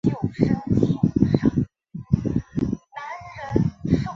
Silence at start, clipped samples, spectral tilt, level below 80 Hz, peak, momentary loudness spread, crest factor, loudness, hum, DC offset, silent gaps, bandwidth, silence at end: 0.05 s; under 0.1%; -9 dB/octave; -40 dBFS; -2 dBFS; 15 LU; 20 dB; -23 LUFS; none; under 0.1%; none; 7.4 kHz; 0 s